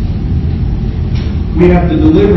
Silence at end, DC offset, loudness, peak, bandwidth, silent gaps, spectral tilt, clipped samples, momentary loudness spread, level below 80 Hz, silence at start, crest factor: 0 s; under 0.1%; -12 LUFS; 0 dBFS; 6 kHz; none; -10 dB/octave; 0.9%; 7 LU; -16 dBFS; 0 s; 10 dB